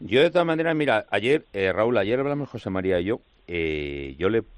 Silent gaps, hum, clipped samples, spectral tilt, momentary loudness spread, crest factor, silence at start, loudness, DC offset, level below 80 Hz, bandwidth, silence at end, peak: none; none; under 0.1%; -7 dB/octave; 9 LU; 16 dB; 0 s; -24 LUFS; under 0.1%; -50 dBFS; 10.5 kHz; 0 s; -8 dBFS